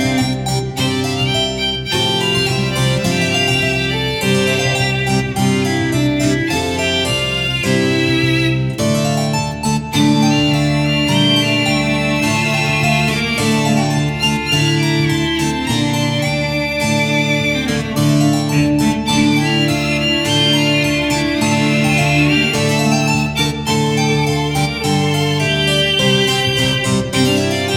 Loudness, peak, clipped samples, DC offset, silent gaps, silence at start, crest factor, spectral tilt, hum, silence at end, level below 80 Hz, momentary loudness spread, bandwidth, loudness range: -15 LUFS; -2 dBFS; under 0.1%; under 0.1%; none; 0 s; 14 dB; -4.5 dB/octave; none; 0 s; -36 dBFS; 4 LU; 18 kHz; 2 LU